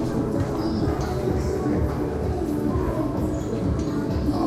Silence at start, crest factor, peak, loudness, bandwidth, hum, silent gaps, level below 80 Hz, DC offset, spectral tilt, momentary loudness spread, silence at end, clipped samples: 0 s; 12 dB; -12 dBFS; -25 LUFS; 14.5 kHz; none; none; -32 dBFS; under 0.1%; -8 dB/octave; 2 LU; 0 s; under 0.1%